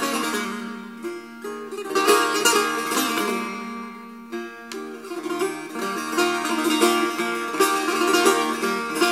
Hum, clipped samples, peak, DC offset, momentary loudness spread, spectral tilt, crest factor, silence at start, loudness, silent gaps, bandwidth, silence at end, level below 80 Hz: none; under 0.1%; -4 dBFS; under 0.1%; 16 LU; -2 dB/octave; 20 dB; 0 s; -22 LUFS; none; 16 kHz; 0 s; -74 dBFS